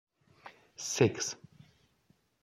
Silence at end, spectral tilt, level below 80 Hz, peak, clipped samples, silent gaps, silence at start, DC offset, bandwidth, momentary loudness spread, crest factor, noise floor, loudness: 1.05 s; -4 dB/octave; -72 dBFS; -12 dBFS; under 0.1%; none; 0.45 s; under 0.1%; 14.5 kHz; 25 LU; 24 dB; -71 dBFS; -32 LUFS